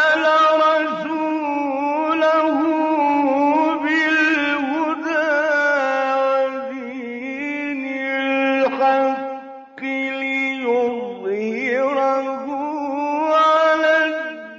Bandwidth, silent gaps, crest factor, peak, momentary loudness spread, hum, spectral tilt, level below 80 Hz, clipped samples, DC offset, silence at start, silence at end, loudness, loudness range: 7.8 kHz; none; 12 dB; -6 dBFS; 11 LU; none; -0.5 dB/octave; -70 dBFS; under 0.1%; under 0.1%; 0 s; 0 s; -19 LUFS; 4 LU